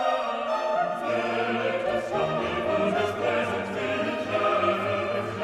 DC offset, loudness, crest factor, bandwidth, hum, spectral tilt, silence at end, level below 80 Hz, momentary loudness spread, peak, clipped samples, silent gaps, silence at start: under 0.1%; -26 LUFS; 14 dB; 13 kHz; none; -5.5 dB/octave; 0 s; -62 dBFS; 3 LU; -12 dBFS; under 0.1%; none; 0 s